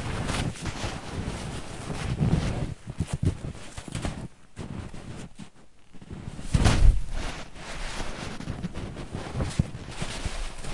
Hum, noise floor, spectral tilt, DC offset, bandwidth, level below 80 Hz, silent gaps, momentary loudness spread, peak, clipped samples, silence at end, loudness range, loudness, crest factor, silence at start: none; -52 dBFS; -5.5 dB/octave; 0.4%; 11.5 kHz; -32 dBFS; none; 16 LU; -4 dBFS; under 0.1%; 0 s; 6 LU; -31 LUFS; 24 dB; 0 s